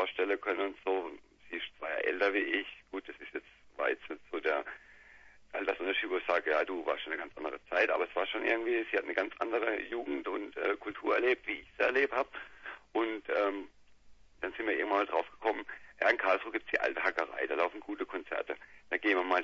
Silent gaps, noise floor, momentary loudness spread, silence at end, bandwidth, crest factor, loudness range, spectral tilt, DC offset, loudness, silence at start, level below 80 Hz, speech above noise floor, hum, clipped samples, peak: none; -57 dBFS; 13 LU; 0 s; 7.4 kHz; 22 dB; 3 LU; 0.5 dB/octave; under 0.1%; -33 LUFS; 0 s; -70 dBFS; 24 dB; none; under 0.1%; -12 dBFS